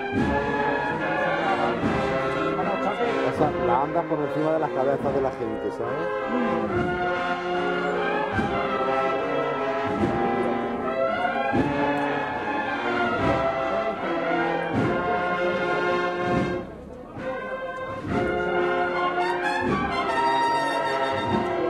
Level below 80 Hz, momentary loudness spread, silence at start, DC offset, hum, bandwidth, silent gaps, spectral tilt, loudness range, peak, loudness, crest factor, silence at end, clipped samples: -48 dBFS; 4 LU; 0 s; under 0.1%; none; 12 kHz; none; -6.5 dB/octave; 2 LU; -8 dBFS; -25 LUFS; 16 dB; 0 s; under 0.1%